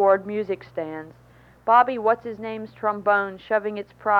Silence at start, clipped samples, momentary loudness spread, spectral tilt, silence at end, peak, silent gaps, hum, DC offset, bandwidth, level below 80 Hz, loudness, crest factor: 0 s; under 0.1%; 14 LU; -7 dB/octave; 0 s; -6 dBFS; none; none; under 0.1%; 6 kHz; -62 dBFS; -24 LUFS; 18 dB